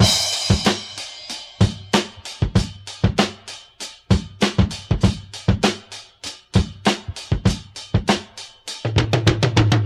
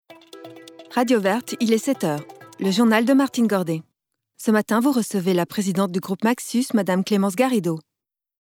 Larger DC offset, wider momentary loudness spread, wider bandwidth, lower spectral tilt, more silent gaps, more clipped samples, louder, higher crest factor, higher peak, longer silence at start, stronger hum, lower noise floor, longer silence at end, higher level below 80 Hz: neither; first, 15 LU vs 12 LU; second, 14 kHz vs 18.5 kHz; about the same, -5 dB/octave vs -5.5 dB/octave; neither; neither; about the same, -21 LUFS vs -21 LUFS; about the same, 20 dB vs 16 dB; first, 0 dBFS vs -6 dBFS; about the same, 0 s vs 0.1 s; neither; second, -39 dBFS vs -84 dBFS; second, 0 s vs 0.6 s; first, -32 dBFS vs -74 dBFS